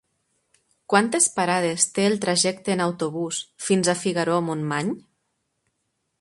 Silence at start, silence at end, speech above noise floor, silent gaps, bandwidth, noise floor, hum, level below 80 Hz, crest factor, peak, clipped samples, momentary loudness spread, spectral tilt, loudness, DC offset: 0.9 s; 1.2 s; 53 dB; none; 11.5 kHz; -76 dBFS; none; -68 dBFS; 22 dB; -2 dBFS; under 0.1%; 8 LU; -3.5 dB/octave; -22 LUFS; under 0.1%